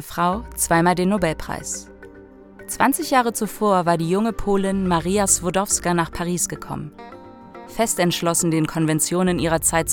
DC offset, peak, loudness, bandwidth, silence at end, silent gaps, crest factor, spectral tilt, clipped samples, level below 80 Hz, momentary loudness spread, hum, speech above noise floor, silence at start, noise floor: under 0.1%; -2 dBFS; -20 LUFS; 19 kHz; 0 s; none; 18 dB; -4 dB/octave; under 0.1%; -42 dBFS; 13 LU; none; 23 dB; 0 s; -44 dBFS